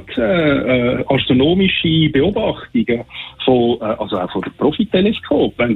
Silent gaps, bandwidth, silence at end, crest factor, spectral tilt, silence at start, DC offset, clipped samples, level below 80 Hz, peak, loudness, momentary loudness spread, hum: none; 4.3 kHz; 0 s; 14 dB; -9 dB/octave; 0 s; under 0.1%; under 0.1%; -40 dBFS; -2 dBFS; -16 LUFS; 7 LU; none